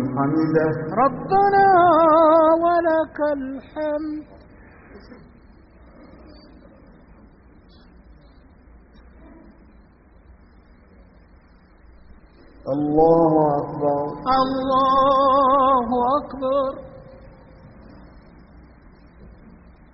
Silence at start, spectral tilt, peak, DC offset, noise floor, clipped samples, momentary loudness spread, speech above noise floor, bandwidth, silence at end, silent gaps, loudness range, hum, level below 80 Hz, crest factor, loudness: 0 s; -5.5 dB/octave; -4 dBFS; under 0.1%; -51 dBFS; under 0.1%; 14 LU; 33 dB; 5.8 kHz; 0.65 s; none; 15 LU; none; -48 dBFS; 18 dB; -18 LUFS